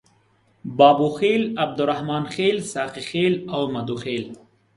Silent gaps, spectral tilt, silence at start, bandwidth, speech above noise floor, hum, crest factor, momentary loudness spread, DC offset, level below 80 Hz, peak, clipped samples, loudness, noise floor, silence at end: none; -5.5 dB/octave; 0.65 s; 11.5 kHz; 40 dB; none; 20 dB; 13 LU; under 0.1%; -62 dBFS; -2 dBFS; under 0.1%; -21 LUFS; -61 dBFS; 0.4 s